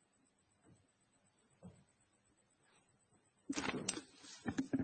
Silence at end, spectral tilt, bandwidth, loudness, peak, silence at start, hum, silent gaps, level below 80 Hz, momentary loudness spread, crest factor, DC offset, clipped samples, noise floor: 0 s; -3.5 dB/octave; 8.4 kHz; -43 LUFS; -18 dBFS; 0.65 s; none; none; -74 dBFS; 21 LU; 30 dB; under 0.1%; under 0.1%; -77 dBFS